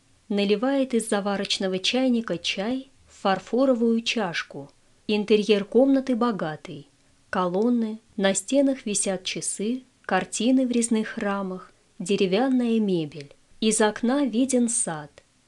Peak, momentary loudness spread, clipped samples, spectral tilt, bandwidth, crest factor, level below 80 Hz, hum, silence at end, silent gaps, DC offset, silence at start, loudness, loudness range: -6 dBFS; 11 LU; under 0.1%; -4 dB/octave; 12 kHz; 18 dB; -62 dBFS; none; 0.4 s; none; under 0.1%; 0.3 s; -24 LUFS; 2 LU